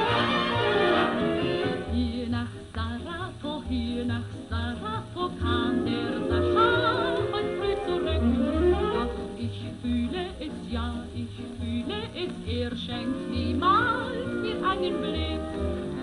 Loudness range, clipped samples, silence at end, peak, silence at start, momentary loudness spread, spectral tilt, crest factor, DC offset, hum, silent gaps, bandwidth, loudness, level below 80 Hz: 7 LU; under 0.1%; 0 s; -10 dBFS; 0 s; 11 LU; -6.5 dB/octave; 16 dB; under 0.1%; none; none; 11.5 kHz; -28 LUFS; -40 dBFS